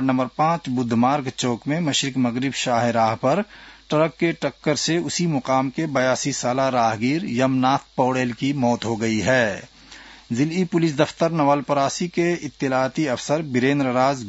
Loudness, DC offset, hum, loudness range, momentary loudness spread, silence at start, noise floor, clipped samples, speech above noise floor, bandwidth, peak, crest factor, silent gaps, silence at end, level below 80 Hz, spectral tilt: -21 LUFS; under 0.1%; none; 1 LU; 4 LU; 0 s; -44 dBFS; under 0.1%; 23 dB; 8 kHz; -2 dBFS; 18 dB; none; 0 s; -58 dBFS; -5 dB/octave